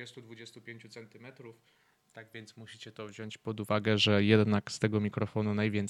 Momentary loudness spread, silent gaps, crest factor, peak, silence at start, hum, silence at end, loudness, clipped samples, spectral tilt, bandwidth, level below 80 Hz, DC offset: 24 LU; none; 22 dB; -10 dBFS; 0 s; none; 0 s; -29 LUFS; under 0.1%; -6 dB/octave; 12.5 kHz; -72 dBFS; under 0.1%